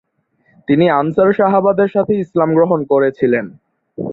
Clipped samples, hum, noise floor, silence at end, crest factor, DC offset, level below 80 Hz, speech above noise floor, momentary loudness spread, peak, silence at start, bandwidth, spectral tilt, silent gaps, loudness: under 0.1%; none; -59 dBFS; 0 s; 14 dB; under 0.1%; -56 dBFS; 46 dB; 7 LU; -2 dBFS; 0.7 s; 4.2 kHz; -10 dB/octave; none; -14 LUFS